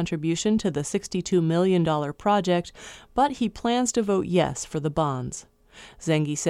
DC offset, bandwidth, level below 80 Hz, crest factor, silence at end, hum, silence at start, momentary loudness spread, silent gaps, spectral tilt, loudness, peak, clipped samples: under 0.1%; 12.5 kHz; -52 dBFS; 16 dB; 0 s; none; 0 s; 10 LU; none; -5.5 dB/octave; -25 LUFS; -8 dBFS; under 0.1%